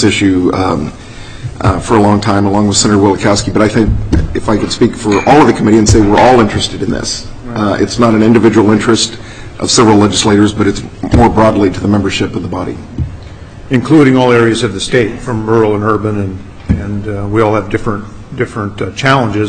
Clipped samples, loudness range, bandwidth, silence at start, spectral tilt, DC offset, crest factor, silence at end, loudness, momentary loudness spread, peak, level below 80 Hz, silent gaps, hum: under 0.1%; 4 LU; 10.5 kHz; 0 s; -5.5 dB/octave; under 0.1%; 10 dB; 0 s; -10 LUFS; 13 LU; 0 dBFS; -26 dBFS; none; none